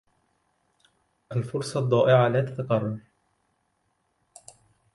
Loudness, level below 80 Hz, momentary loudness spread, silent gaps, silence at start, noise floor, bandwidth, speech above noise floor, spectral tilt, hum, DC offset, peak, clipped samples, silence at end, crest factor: -24 LUFS; -66 dBFS; 13 LU; none; 1.3 s; -73 dBFS; 11.5 kHz; 50 dB; -7 dB/octave; none; under 0.1%; -8 dBFS; under 0.1%; 1.95 s; 20 dB